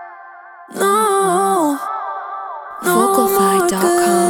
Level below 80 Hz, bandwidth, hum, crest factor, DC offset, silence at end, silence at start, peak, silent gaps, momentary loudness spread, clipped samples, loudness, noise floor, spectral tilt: -56 dBFS; over 20 kHz; none; 16 dB; under 0.1%; 0 s; 0 s; 0 dBFS; none; 14 LU; under 0.1%; -15 LUFS; -38 dBFS; -4 dB/octave